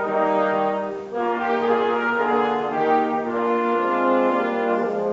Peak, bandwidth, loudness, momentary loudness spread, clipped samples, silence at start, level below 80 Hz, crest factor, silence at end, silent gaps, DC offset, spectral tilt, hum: -8 dBFS; 7.6 kHz; -21 LUFS; 4 LU; under 0.1%; 0 s; -66 dBFS; 14 dB; 0 s; none; under 0.1%; -6.5 dB/octave; none